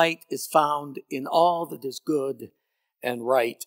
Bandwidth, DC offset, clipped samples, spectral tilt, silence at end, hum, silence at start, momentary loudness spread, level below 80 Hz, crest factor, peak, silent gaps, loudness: 16 kHz; under 0.1%; under 0.1%; -4 dB/octave; 0 s; none; 0 s; 12 LU; -88 dBFS; 20 dB; -6 dBFS; none; -26 LUFS